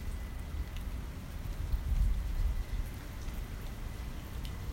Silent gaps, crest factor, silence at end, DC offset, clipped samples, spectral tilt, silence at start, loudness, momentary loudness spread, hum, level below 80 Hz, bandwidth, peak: none; 16 dB; 0 s; under 0.1%; under 0.1%; -6 dB/octave; 0 s; -40 LUFS; 9 LU; none; -36 dBFS; 16 kHz; -20 dBFS